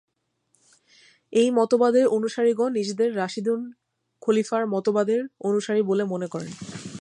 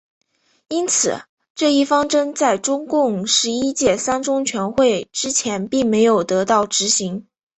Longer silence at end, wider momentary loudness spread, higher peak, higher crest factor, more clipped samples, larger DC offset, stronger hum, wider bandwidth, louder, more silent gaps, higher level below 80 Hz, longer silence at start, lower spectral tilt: second, 0 s vs 0.35 s; first, 12 LU vs 6 LU; second, -8 dBFS vs -2 dBFS; about the same, 16 dB vs 16 dB; neither; neither; neither; first, 11 kHz vs 8.4 kHz; second, -23 LUFS vs -18 LUFS; second, none vs 1.29-1.37 s, 1.50-1.55 s; second, -72 dBFS vs -54 dBFS; first, 1.3 s vs 0.7 s; first, -5.5 dB/octave vs -3 dB/octave